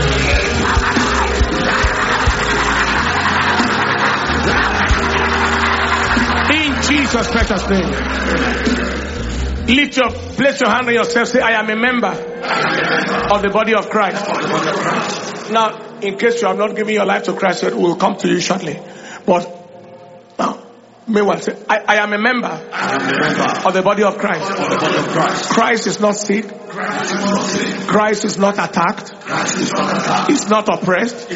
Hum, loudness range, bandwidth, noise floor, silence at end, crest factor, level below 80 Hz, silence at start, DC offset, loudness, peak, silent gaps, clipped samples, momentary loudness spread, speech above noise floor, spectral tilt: none; 4 LU; 8 kHz; -40 dBFS; 0 s; 16 dB; -30 dBFS; 0 s; under 0.1%; -15 LUFS; 0 dBFS; none; under 0.1%; 7 LU; 24 dB; -4 dB/octave